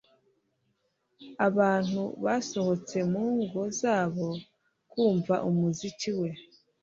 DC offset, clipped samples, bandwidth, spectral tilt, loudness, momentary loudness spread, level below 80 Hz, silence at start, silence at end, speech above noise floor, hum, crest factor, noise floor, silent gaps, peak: under 0.1%; under 0.1%; 7.8 kHz; -6 dB/octave; -29 LUFS; 10 LU; -70 dBFS; 1.2 s; 0.4 s; 47 dB; none; 18 dB; -75 dBFS; none; -10 dBFS